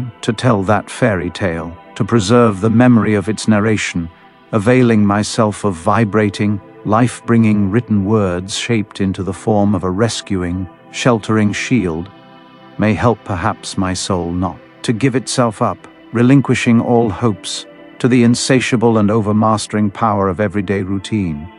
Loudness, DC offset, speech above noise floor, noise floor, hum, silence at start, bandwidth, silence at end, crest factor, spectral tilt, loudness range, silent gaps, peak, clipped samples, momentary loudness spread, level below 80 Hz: -15 LUFS; under 0.1%; 26 dB; -40 dBFS; none; 0 s; 11.5 kHz; 0.1 s; 14 dB; -6 dB/octave; 4 LU; none; 0 dBFS; under 0.1%; 9 LU; -46 dBFS